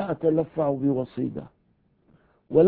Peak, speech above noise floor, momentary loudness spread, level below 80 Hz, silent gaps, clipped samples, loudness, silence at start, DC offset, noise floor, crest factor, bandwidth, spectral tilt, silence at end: -6 dBFS; 40 dB; 8 LU; -58 dBFS; none; under 0.1%; -26 LUFS; 0 s; under 0.1%; -66 dBFS; 18 dB; 4.3 kHz; -13 dB/octave; 0 s